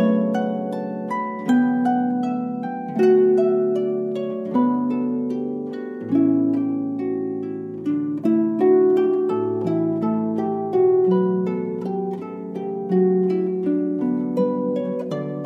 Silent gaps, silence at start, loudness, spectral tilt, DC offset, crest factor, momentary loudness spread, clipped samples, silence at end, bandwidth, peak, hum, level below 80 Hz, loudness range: none; 0 s; -21 LUFS; -9.5 dB/octave; under 0.1%; 14 dB; 10 LU; under 0.1%; 0 s; 7.6 kHz; -8 dBFS; none; -74 dBFS; 3 LU